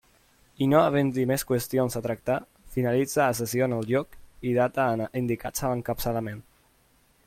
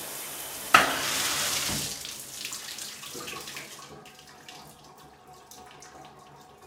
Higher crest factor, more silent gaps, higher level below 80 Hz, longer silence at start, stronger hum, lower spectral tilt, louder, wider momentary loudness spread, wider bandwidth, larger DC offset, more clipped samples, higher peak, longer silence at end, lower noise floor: second, 20 dB vs 32 dB; neither; first, -52 dBFS vs -60 dBFS; first, 0.6 s vs 0 s; neither; first, -6 dB/octave vs -0.5 dB/octave; about the same, -26 LUFS vs -28 LUFS; second, 8 LU vs 27 LU; about the same, 16.5 kHz vs 18 kHz; neither; neither; second, -6 dBFS vs 0 dBFS; first, 0.85 s vs 0 s; first, -63 dBFS vs -51 dBFS